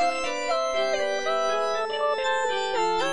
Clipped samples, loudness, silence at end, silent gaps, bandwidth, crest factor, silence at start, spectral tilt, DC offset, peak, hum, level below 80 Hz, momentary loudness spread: under 0.1%; -25 LUFS; 0 s; none; 10.5 kHz; 12 dB; 0 s; -1.5 dB/octave; 1%; -14 dBFS; none; -60 dBFS; 2 LU